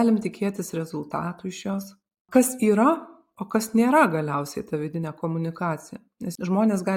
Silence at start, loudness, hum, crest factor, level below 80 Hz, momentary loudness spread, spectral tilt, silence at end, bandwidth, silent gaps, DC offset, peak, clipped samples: 0 s; -24 LUFS; none; 20 dB; -66 dBFS; 13 LU; -6 dB/octave; 0 s; 17 kHz; 2.20-2.25 s; under 0.1%; -4 dBFS; under 0.1%